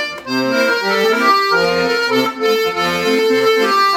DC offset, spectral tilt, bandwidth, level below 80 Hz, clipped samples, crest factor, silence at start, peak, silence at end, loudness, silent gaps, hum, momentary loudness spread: under 0.1%; -3.5 dB/octave; 18 kHz; -58 dBFS; under 0.1%; 14 dB; 0 s; 0 dBFS; 0 s; -14 LUFS; none; none; 4 LU